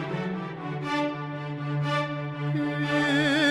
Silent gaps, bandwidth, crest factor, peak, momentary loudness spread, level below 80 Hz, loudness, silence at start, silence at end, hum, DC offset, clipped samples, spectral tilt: none; 11.5 kHz; 16 dB; -12 dBFS; 11 LU; -64 dBFS; -28 LUFS; 0 s; 0 s; none; under 0.1%; under 0.1%; -6 dB/octave